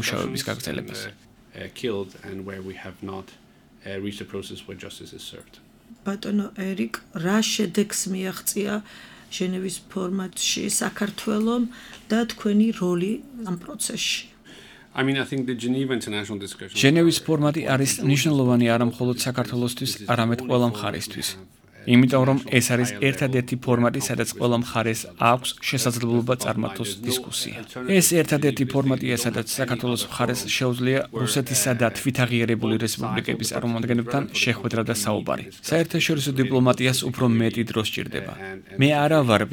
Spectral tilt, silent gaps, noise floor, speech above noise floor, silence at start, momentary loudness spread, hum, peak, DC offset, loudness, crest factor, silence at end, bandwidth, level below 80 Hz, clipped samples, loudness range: -4.5 dB/octave; none; -47 dBFS; 23 dB; 0 s; 15 LU; none; -2 dBFS; under 0.1%; -23 LUFS; 22 dB; 0 s; 19.5 kHz; -58 dBFS; under 0.1%; 10 LU